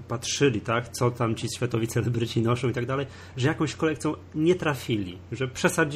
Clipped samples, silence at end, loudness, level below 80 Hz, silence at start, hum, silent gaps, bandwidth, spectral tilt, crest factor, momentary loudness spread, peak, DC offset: under 0.1%; 0 s; -27 LUFS; -56 dBFS; 0 s; none; none; 15 kHz; -5.5 dB/octave; 18 dB; 7 LU; -8 dBFS; under 0.1%